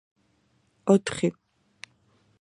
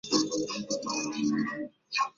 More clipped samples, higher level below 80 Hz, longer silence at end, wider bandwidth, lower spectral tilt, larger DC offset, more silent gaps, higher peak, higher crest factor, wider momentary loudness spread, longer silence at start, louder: neither; about the same, -66 dBFS vs -68 dBFS; first, 1.1 s vs 0.1 s; first, 11 kHz vs 7.6 kHz; first, -6 dB/octave vs -3 dB/octave; neither; neither; first, -6 dBFS vs -12 dBFS; about the same, 22 dB vs 20 dB; first, 25 LU vs 6 LU; first, 0.85 s vs 0.05 s; first, -25 LUFS vs -31 LUFS